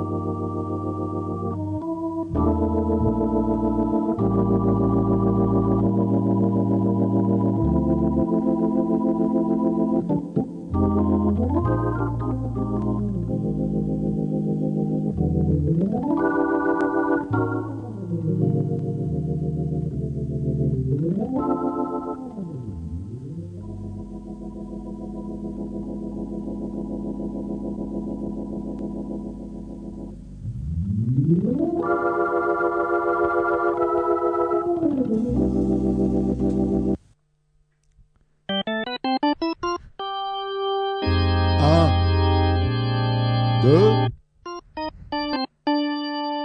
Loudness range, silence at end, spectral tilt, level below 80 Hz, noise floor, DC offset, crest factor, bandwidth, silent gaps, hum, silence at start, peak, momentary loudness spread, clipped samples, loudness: 10 LU; 0 s; -9 dB/octave; -38 dBFS; -64 dBFS; under 0.1%; 18 dB; 8.6 kHz; none; none; 0 s; -4 dBFS; 12 LU; under 0.1%; -23 LUFS